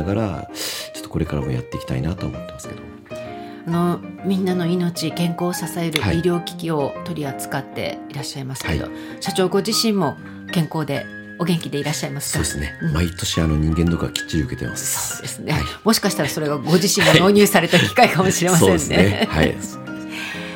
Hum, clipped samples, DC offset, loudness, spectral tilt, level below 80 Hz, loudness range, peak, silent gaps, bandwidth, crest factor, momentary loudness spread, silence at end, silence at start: none; under 0.1%; under 0.1%; -20 LUFS; -4.5 dB/octave; -40 dBFS; 10 LU; 0 dBFS; none; 17 kHz; 20 dB; 14 LU; 0 s; 0 s